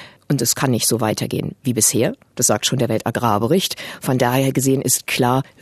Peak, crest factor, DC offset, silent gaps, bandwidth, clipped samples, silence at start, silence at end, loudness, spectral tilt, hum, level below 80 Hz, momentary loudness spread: -2 dBFS; 18 dB; under 0.1%; none; 14 kHz; under 0.1%; 0 s; 0.2 s; -18 LUFS; -4 dB/octave; none; -54 dBFS; 7 LU